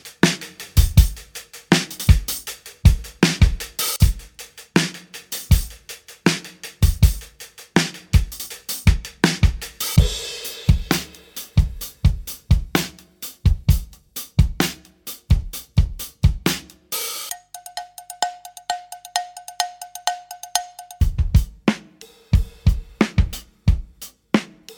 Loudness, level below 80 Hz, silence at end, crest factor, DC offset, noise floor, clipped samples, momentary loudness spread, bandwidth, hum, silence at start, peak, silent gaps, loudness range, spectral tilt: -22 LUFS; -24 dBFS; 0.05 s; 20 dB; under 0.1%; -47 dBFS; under 0.1%; 16 LU; over 20 kHz; none; 0.05 s; 0 dBFS; none; 6 LU; -4.5 dB/octave